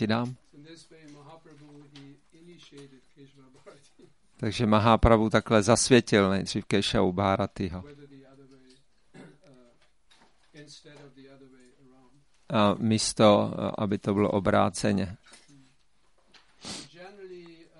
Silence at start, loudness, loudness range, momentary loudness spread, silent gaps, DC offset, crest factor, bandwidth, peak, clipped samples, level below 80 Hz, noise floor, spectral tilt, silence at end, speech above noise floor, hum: 0 s; -25 LUFS; 12 LU; 26 LU; none; under 0.1%; 24 dB; 11.5 kHz; -6 dBFS; under 0.1%; -46 dBFS; -69 dBFS; -5 dB/octave; 0.35 s; 44 dB; none